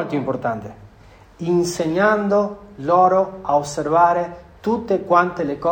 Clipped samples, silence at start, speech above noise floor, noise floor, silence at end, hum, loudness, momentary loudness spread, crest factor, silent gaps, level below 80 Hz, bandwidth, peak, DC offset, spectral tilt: under 0.1%; 0 s; 28 dB; -47 dBFS; 0 s; none; -19 LUFS; 12 LU; 18 dB; none; -52 dBFS; 16 kHz; -2 dBFS; under 0.1%; -6 dB/octave